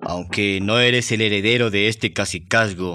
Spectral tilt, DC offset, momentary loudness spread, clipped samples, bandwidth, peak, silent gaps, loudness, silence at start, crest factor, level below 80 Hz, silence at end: -4 dB/octave; under 0.1%; 6 LU; under 0.1%; 13.5 kHz; -2 dBFS; none; -18 LUFS; 0 s; 16 dB; -54 dBFS; 0 s